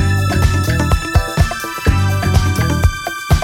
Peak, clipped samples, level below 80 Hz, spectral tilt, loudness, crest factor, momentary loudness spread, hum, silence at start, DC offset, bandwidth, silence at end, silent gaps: 0 dBFS; under 0.1%; -20 dBFS; -5.5 dB/octave; -16 LUFS; 14 dB; 3 LU; none; 0 s; under 0.1%; 17 kHz; 0 s; none